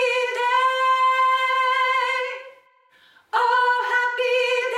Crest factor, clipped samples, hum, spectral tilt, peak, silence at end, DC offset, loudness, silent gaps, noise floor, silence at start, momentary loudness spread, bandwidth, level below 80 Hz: 14 dB; under 0.1%; none; 2.5 dB/octave; -8 dBFS; 0 s; under 0.1%; -20 LUFS; none; -57 dBFS; 0 s; 6 LU; 13.5 kHz; -86 dBFS